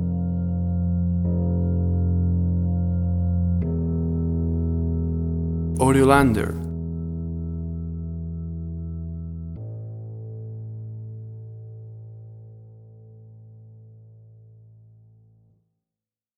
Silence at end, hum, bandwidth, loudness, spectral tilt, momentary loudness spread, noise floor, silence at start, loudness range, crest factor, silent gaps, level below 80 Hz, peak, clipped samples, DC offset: 1.9 s; none; 12.5 kHz; -24 LUFS; -8 dB/octave; 17 LU; -90 dBFS; 0 s; 19 LU; 24 dB; none; -36 dBFS; -2 dBFS; under 0.1%; under 0.1%